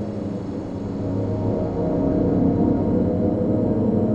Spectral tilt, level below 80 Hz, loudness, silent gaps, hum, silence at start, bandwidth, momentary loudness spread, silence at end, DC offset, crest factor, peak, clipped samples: -11 dB/octave; -40 dBFS; -22 LUFS; none; none; 0 s; 7.8 kHz; 9 LU; 0 s; under 0.1%; 14 dB; -6 dBFS; under 0.1%